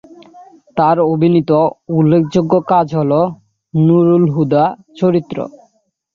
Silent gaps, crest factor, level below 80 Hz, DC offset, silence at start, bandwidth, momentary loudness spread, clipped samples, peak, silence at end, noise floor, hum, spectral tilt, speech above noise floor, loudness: none; 12 dB; -54 dBFS; under 0.1%; 0.35 s; 7 kHz; 9 LU; under 0.1%; -2 dBFS; 0.65 s; -59 dBFS; none; -9.5 dB/octave; 47 dB; -14 LUFS